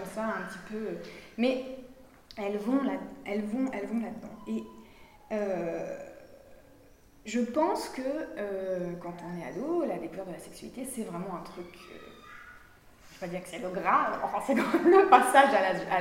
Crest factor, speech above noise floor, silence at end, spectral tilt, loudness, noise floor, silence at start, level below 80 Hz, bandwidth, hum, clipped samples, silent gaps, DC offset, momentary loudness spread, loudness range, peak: 26 dB; 28 dB; 0 s; -5 dB/octave; -29 LUFS; -57 dBFS; 0 s; -62 dBFS; 16 kHz; none; under 0.1%; none; under 0.1%; 23 LU; 12 LU; -4 dBFS